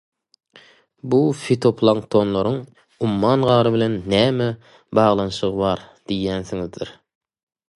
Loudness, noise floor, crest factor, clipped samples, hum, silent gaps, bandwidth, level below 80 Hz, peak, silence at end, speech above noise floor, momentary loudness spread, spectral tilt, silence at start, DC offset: -20 LUFS; -51 dBFS; 18 dB; under 0.1%; none; none; 11.5 kHz; -50 dBFS; -2 dBFS; 0.85 s; 32 dB; 12 LU; -7 dB/octave; 1.05 s; under 0.1%